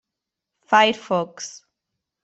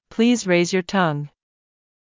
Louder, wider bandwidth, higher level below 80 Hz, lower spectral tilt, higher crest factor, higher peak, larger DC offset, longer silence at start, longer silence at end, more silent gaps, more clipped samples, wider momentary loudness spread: about the same, -20 LUFS vs -20 LUFS; about the same, 8.2 kHz vs 7.6 kHz; second, -70 dBFS vs -62 dBFS; second, -3 dB/octave vs -5 dB/octave; first, 22 dB vs 16 dB; first, -2 dBFS vs -6 dBFS; neither; first, 0.7 s vs 0.1 s; second, 0.7 s vs 0.9 s; neither; neither; first, 18 LU vs 11 LU